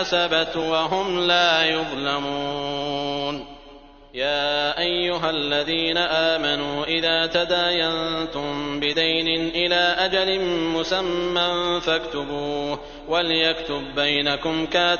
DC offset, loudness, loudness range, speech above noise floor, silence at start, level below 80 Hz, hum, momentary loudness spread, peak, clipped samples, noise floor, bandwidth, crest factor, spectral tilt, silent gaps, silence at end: under 0.1%; -21 LUFS; 3 LU; 23 dB; 0 s; -48 dBFS; none; 8 LU; -6 dBFS; under 0.1%; -46 dBFS; 7 kHz; 18 dB; -1 dB/octave; none; 0 s